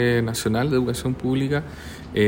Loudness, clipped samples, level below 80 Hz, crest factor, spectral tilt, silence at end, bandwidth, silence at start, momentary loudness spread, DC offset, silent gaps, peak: -23 LUFS; under 0.1%; -44 dBFS; 14 dB; -6 dB/octave; 0 s; 16.5 kHz; 0 s; 9 LU; under 0.1%; none; -8 dBFS